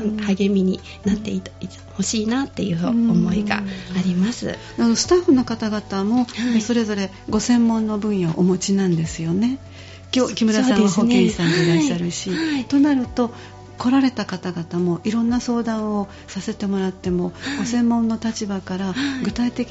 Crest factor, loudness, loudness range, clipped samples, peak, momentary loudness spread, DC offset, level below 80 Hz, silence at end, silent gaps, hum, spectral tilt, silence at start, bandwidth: 18 dB; -20 LUFS; 4 LU; under 0.1%; -2 dBFS; 10 LU; under 0.1%; -46 dBFS; 0 s; none; none; -5.5 dB/octave; 0 s; 8 kHz